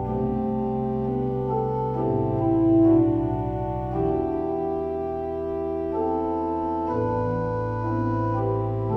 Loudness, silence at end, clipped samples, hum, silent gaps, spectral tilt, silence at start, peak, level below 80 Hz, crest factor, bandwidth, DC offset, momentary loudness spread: -25 LUFS; 0 s; under 0.1%; none; none; -11.5 dB/octave; 0 s; -8 dBFS; -42 dBFS; 14 dB; 4.1 kHz; under 0.1%; 8 LU